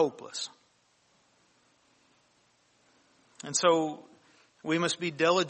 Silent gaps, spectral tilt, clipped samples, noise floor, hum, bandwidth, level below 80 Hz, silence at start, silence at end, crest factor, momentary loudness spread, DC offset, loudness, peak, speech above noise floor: none; -3 dB/octave; under 0.1%; -68 dBFS; none; 8.4 kHz; -80 dBFS; 0 s; 0 s; 22 dB; 17 LU; under 0.1%; -29 LUFS; -10 dBFS; 40 dB